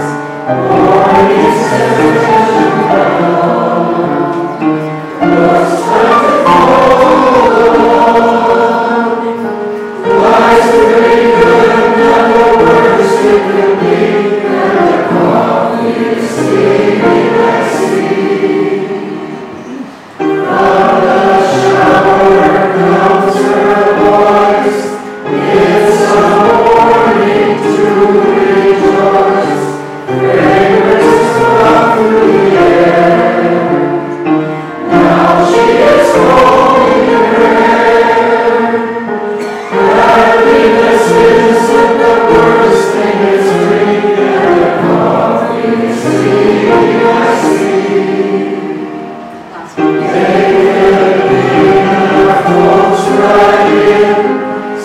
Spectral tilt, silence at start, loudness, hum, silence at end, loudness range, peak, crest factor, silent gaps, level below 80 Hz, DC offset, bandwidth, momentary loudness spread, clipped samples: -6 dB/octave; 0 s; -8 LUFS; none; 0 s; 4 LU; 0 dBFS; 8 dB; none; -40 dBFS; under 0.1%; 14 kHz; 9 LU; under 0.1%